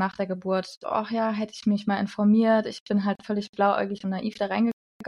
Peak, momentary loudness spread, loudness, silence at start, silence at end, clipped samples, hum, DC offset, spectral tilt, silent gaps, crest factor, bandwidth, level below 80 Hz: -10 dBFS; 8 LU; -26 LUFS; 0 s; 0 s; under 0.1%; none; under 0.1%; -7 dB/octave; 0.77-0.81 s, 2.80-2.86 s, 3.49-3.53 s, 4.73-5.00 s; 16 dB; 10 kHz; -70 dBFS